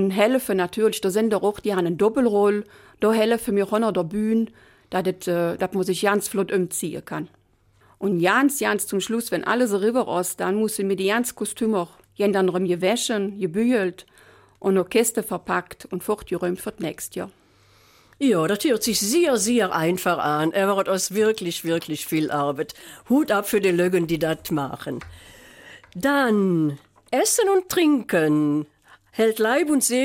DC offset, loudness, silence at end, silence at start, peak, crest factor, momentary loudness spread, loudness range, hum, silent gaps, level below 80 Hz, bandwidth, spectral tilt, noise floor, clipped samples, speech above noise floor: under 0.1%; -22 LUFS; 0 s; 0 s; -6 dBFS; 18 dB; 10 LU; 4 LU; none; none; -58 dBFS; 16.5 kHz; -4.5 dB/octave; -59 dBFS; under 0.1%; 38 dB